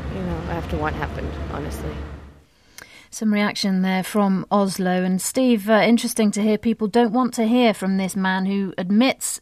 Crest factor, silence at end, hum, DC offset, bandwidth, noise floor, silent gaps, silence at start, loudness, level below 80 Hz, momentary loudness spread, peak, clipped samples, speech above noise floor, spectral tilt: 14 dB; 0 s; none; under 0.1%; 15.5 kHz; -50 dBFS; none; 0 s; -21 LUFS; -40 dBFS; 12 LU; -6 dBFS; under 0.1%; 30 dB; -5 dB/octave